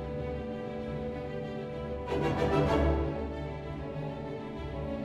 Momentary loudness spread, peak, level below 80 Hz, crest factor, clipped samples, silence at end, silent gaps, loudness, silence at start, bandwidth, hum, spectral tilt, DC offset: 11 LU; -16 dBFS; -40 dBFS; 16 dB; under 0.1%; 0 s; none; -34 LUFS; 0 s; 10.5 kHz; none; -8 dB/octave; under 0.1%